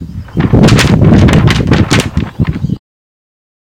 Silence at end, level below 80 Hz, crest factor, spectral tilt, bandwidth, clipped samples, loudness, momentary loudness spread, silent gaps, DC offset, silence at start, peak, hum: 1 s; -22 dBFS; 10 dB; -6 dB/octave; 16.5 kHz; 2%; -9 LUFS; 12 LU; none; under 0.1%; 0 s; 0 dBFS; none